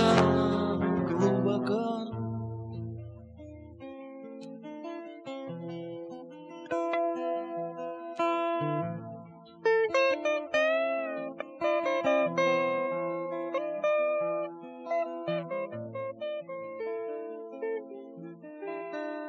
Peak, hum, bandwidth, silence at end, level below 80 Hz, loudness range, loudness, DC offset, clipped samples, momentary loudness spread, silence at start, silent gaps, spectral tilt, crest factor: -6 dBFS; none; 10 kHz; 0 s; -64 dBFS; 12 LU; -31 LUFS; under 0.1%; under 0.1%; 18 LU; 0 s; none; -6.5 dB/octave; 24 dB